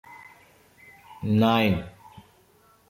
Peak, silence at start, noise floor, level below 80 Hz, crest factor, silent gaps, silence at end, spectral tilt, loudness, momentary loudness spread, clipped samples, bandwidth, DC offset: -6 dBFS; 0.1 s; -59 dBFS; -58 dBFS; 20 dB; none; 0.7 s; -7.5 dB/octave; -23 LUFS; 26 LU; under 0.1%; 16 kHz; under 0.1%